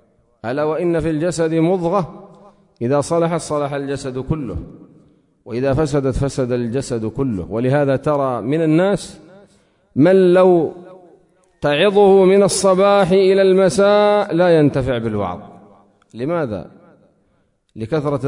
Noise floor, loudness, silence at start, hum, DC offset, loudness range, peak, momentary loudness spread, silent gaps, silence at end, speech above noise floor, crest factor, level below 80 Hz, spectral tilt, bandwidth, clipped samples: -62 dBFS; -16 LUFS; 0.45 s; none; under 0.1%; 9 LU; -2 dBFS; 13 LU; none; 0 s; 46 dB; 14 dB; -42 dBFS; -6 dB/octave; 11 kHz; under 0.1%